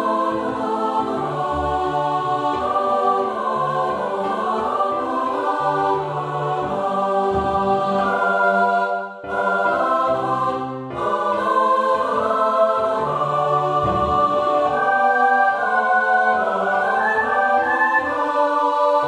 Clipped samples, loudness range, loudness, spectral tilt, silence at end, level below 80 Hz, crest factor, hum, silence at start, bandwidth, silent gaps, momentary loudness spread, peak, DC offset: under 0.1%; 4 LU; -19 LUFS; -6 dB/octave; 0 s; -48 dBFS; 14 dB; none; 0 s; 11.5 kHz; none; 6 LU; -6 dBFS; under 0.1%